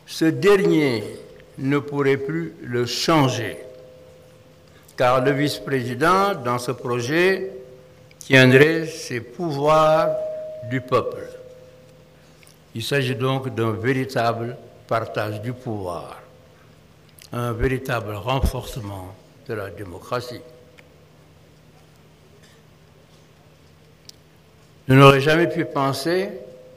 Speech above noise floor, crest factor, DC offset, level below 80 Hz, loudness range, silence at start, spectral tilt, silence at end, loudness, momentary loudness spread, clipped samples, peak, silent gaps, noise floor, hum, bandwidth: 32 dB; 22 dB; under 0.1%; -42 dBFS; 11 LU; 0.1 s; -6 dB/octave; 0.1 s; -20 LUFS; 20 LU; under 0.1%; 0 dBFS; none; -52 dBFS; none; 15.5 kHz